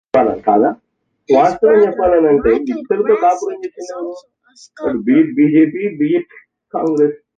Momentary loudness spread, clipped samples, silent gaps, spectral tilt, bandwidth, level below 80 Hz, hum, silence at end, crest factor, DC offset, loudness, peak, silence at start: 15 LU; under 0.1%; none; -7.5 dB/octave; 7.6 kHz; -46 dBFS; none; 0.2 s; 14 dB; under 0.1%; -14 LUFS; 0 dBFS; 0.15 s